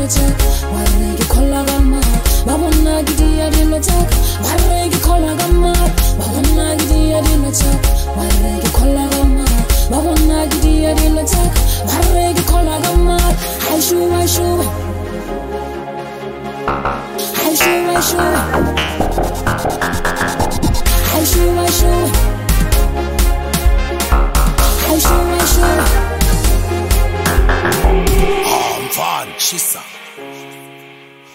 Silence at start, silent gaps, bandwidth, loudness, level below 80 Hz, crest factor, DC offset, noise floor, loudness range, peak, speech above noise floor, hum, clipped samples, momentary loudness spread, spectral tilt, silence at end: 0 s; none; 16.5 kHz; -14 LUFS; -16 dBFS; 12 dB; under 0.1%; -38 dBFS; 3 LU; 0 dBFS; 26 dB; none; under 0.1%; 6 LU; -4.5 dB/octave; 0.4 s